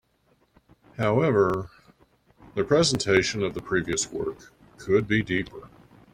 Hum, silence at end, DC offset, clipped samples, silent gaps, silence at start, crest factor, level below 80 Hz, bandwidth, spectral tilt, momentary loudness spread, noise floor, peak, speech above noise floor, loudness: none; 0.45 s; under 0.1%; under 0.1%; none; 1 s; 20 dB; -54 dBFS; 13 kHz; -4.5 dB/octave; 19 LU; -66 dBFS; -6 dBFS; 42 dB; -25 LUFS